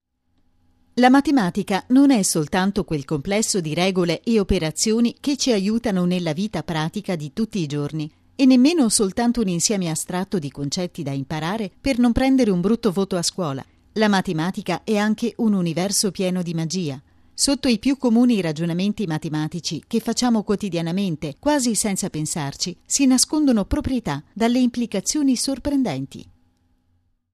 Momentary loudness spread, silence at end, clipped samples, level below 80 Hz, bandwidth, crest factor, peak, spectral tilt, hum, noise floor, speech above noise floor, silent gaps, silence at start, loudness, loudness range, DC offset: 10 LU; 1.15 s; under 0.1%; -42 dBFS; 14 kHz; 18 dB; -2 dBFS; -4.5 dB/octave; none; -65 dBFS; 45 dB; none; 0.95 s; -21 LUFS; 3 LU; under 0.1%